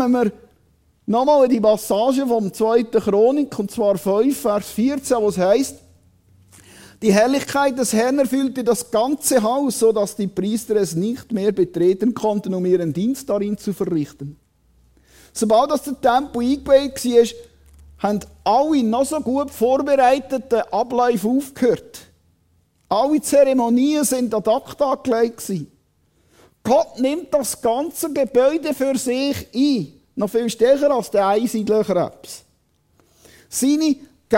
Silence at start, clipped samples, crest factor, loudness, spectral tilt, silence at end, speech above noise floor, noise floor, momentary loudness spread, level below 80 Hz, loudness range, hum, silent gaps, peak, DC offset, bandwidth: 0 s; under 0.1%; 16 dB; -19 LUFS; -5 dB/octave; 0 s; 44 dB; -62 dBFS; 8 LU; -54 dBFS; 3 LU; none; none; -2 dBFS; under 0.1%; 16.5 kHz